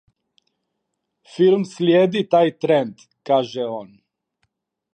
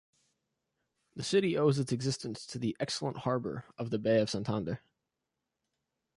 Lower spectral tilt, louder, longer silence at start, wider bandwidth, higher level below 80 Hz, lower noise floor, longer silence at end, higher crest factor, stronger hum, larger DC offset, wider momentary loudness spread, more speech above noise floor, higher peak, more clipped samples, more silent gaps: first, -7 dB/octave vs -5.5 dB/octave; first, -19 LUFS vs -33 LUFS; first, 1.35 s vs 1.15 s; second, 9 kHz vs 11.5 kHz; second, -72 dBFS vs -66 dBFS; second, -77 dBFS vs -87 dBFS; second, 1.1 s vs 1.4 s; about the same, 18 dB vs 18 dB; neither; neither; first, 15 LU vs 11 LU; first, 59 dB vs 55 dB; first, -4 dBFS vs -16 dBFS; neither; neither